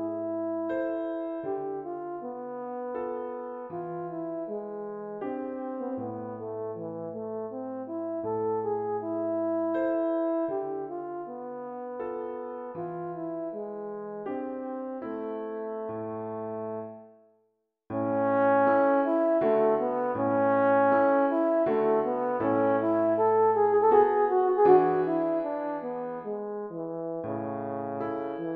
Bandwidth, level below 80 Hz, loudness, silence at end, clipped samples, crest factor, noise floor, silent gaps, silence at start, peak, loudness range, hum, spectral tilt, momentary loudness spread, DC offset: 4.5 kHz; -72 dBFS; -29 LUFS; 0 s; under 0.1%; 20 dB; -75 dBFS; none; 0 s; -8 dBFS; 12 LU; none; -10 dB/octave; 14 LU; under 0.1%